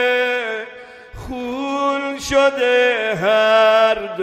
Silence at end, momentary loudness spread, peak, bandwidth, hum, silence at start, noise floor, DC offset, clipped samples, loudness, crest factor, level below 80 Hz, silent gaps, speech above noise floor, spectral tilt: 0 s; 15 LU; -2 dBFS; 14.5 kHz; none; 0 s; -38 dBFS; under 0.1%; under 0.1%; -16 LUFS; 16 dB; -46 dBFS; none; 23 dB; -3.5 dB/octave